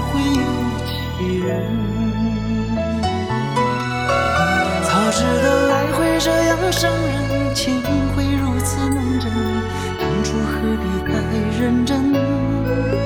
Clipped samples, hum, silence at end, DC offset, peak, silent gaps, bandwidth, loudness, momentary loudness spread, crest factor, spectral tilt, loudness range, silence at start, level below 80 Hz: under 0.1%; none; 0 s; 0.1%; -4 dBFS; none; 19.5 kHz; -19 LUFS; 5 LU; 14 dB; -5.5 dB/octave; 4 LU; 0 s; -32 dBFS